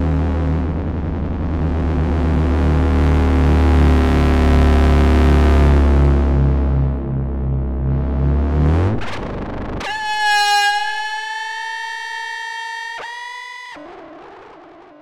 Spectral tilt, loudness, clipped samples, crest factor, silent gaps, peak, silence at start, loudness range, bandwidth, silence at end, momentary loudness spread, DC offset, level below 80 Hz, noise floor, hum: -6.5 dB/octave; -17 LUFS; under 0.1%; 12 dB; none; -4 dBFS; 0 s; 11 LU; 11 kHz; 0.5 s; 13 LU; under 0.1%; -20 dBFS; -41 dBFS; none